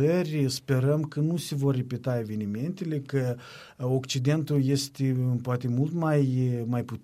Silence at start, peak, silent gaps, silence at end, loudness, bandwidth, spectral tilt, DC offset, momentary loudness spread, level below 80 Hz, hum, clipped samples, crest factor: 0 s; -12 dBFS; none; 0.05 s; -28 LUFS; 15 kHz; -6.5 dB/octave; under 0.1%; 7 LU; -64 dBFS; none; under 0.1%; 14 dB